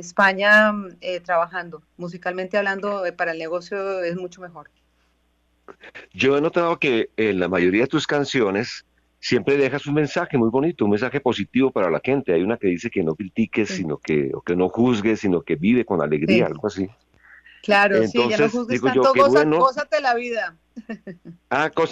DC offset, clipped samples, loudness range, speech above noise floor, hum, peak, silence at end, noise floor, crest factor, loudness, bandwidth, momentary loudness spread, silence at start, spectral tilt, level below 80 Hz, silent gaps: under 0.1%; under 0.1%; 8 LU; 44 dB; none; -6 dBFS; 0 s; -65 dBFS; 16 dB; -20 LUFS; 9 kHz; 15 LU; 0 s; -5.5 dB/octave; -56 dBFS; none